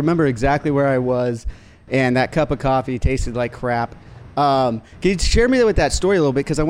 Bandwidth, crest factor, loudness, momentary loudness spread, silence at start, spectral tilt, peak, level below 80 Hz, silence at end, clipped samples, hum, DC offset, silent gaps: 15.5 kHz; 14 dB; -19 LUFS; 8 LU; 0 s; -5.5 dB/octave; -4 dBFS; -28 dBFS; 0 s; under 0.1%; none; under 0.1%; none